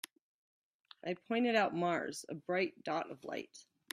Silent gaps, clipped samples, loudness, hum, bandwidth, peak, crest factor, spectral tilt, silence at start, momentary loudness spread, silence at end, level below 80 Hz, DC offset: none; under 0.1%; -37 LUFS; none; 15 kHz; -18 dBFS; 20 dB; -4.5 dB/octave; 1.05 s; 14 LU; 0.3 s; -84 dBFS; under 0.1%